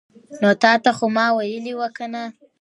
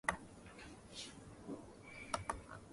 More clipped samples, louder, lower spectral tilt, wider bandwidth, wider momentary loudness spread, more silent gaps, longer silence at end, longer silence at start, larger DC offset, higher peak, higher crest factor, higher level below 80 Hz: neither; first, -19 LUFS vs -49 LUFS; first, -5 dB/octave vs -3.5 dB/octave; about the same, 11 kHz vs 11.5 kHz; about the same, 14 LU vs 12 LU; neither; first, 0.3 s vs 0 s; first, 0.3 s vs 0.05 s; neither; first, -2 dBFS vs -20 dBFS; second, 18 dB vs 30 dB; second, -70 dBFS vs -62 dBFS